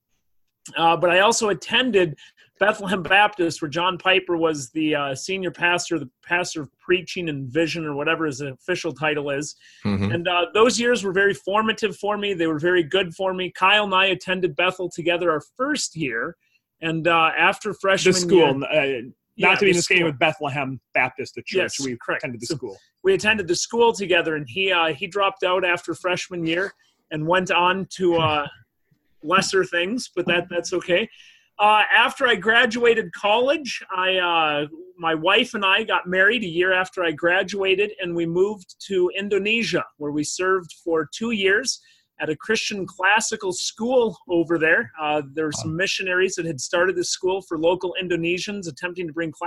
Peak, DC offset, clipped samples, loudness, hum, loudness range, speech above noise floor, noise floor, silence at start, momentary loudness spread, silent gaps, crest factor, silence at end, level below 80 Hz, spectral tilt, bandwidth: -4 dBFS; under 0.1%; under 0.1%; -21 LUFS; none; 5 LU; 50 dB; -71 dBFS; 0.65 s; 10 LU; none; 18 dB; 0 s; -58 dBFS; -3.5 dB/octave; 12.5 kHz